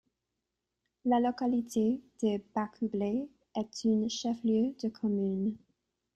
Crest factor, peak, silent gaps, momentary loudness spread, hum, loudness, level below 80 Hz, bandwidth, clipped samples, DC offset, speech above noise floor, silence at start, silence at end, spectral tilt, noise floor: 14 dB; -18 dBFS; none; 8 LU; none; -32 LUFS; -70 dBFS; 12 kHz; under 0.1%; under 0.1%; 55 dB; 1.05 s; 0.6 s; -6 dB/octave; -86 dBFS